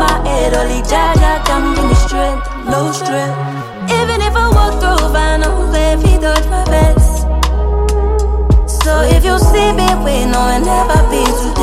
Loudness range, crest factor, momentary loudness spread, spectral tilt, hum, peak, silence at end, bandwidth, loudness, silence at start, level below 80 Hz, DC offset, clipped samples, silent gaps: 2 LU; 10 dB; 6 LU; -5 dB/octave; none; 0 dBFS; 0 s; 15 kHz; -13 LUFS; 0 s; -14 dBFS; under 0.1%; under 0.1%; none